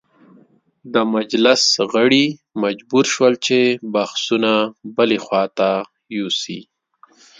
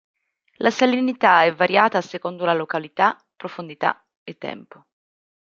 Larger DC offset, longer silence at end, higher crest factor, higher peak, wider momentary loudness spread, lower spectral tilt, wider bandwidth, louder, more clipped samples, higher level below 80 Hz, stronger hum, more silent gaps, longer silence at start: neither; second, 0.75 s vs 0.9 s; about the same, 18 dB vs 20 dB; about the same, 0 dBFS vs -2 dBFS; second, 9 LU vs 18 LU; second, -3.5 dB/octave vs -5 dB/octave; first, 9.4 kHz vs 7.6 kHz; about the same, -17 LUFS vs -19 LUFS; neither; first, -66 dBFS vs -72 dBFS; neither; second, none vs 4.17-4.26 s; first, 0.85 s vs 0.6 s